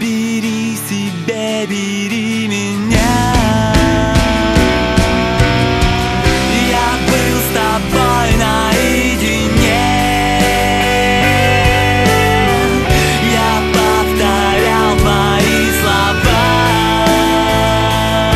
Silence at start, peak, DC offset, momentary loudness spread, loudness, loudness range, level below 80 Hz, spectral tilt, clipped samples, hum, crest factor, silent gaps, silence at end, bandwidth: 0 s; 0 dBFS; under 0.1%; 6 LU; -12 LUFS; 2 LU; -22 dBFS; -4.5 dB/octave; under 0.1%; none; 12 dB; none; 0 s; 14.5 kHz